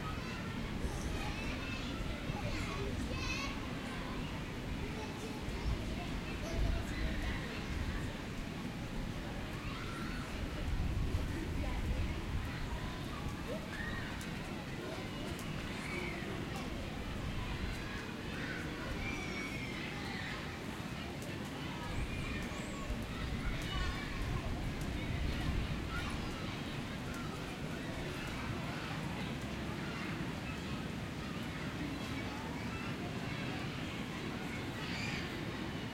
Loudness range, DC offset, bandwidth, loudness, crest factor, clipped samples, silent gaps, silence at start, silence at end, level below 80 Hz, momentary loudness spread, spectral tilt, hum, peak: 2 LU; under 0.1%; 16 kHz; -41 LUFS; 16 dB; under 0.1%; none; 0 s; 0 s; -44 dBFS; 4 LU; -5.5 dB/octave; none; -24 dBFS